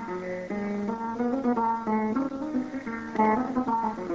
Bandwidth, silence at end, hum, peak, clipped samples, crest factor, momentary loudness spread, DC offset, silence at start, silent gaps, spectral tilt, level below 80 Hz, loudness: 7.6 kHz; 0 s; none; -12 dBFS; under 0.1%; 16 dB; 8 LU; under 0.1%; 0 s; none; -7.5 dB/octave; -58 dBFS; -28 LUFS